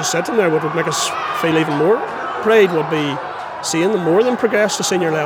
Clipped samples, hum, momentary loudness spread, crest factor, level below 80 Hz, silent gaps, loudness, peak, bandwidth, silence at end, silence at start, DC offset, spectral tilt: under 0.1%; none; 7 LU; 16 dB; -60 dBFS; none; -17 LUFS; -2 dBFS; 19 kHz; 0 s; 0 s; under 0.1%; -4 dB/octave